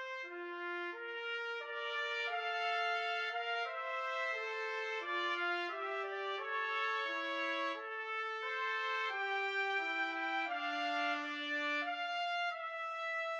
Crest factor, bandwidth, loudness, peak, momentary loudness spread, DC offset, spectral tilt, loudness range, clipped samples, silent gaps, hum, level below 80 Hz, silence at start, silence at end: 16 dB; 9.4 kHz; -38 LUFS; -24 dBFS; 5 LU; under 0.1%; 0 dB/octave; 2 LU; under 0.1%; none; none; under -90 dBFS; 0 s; 0 s